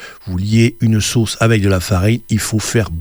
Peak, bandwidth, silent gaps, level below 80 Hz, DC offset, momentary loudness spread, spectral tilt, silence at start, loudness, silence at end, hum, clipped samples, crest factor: -2 dBFS; over 20 kHz; none; -36 dBFS; under 0.1%; 4 LU; -5.5 dB/octave; 0 s; -15 LUFS; 0 s; none; under 0.1%; 14 dB